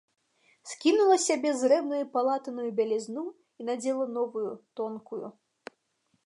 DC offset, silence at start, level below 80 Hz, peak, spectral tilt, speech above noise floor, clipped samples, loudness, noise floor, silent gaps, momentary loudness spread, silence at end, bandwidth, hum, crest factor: under 0.1%; 0.65 s; -88 dBFS; -12 dBFS; -3 dB/octave; 47 dB; under 0.1%; -28 LUFS; -75 dBFS; none; 17 LU; 0.95 s; 11.5 kHz; none; 18 dB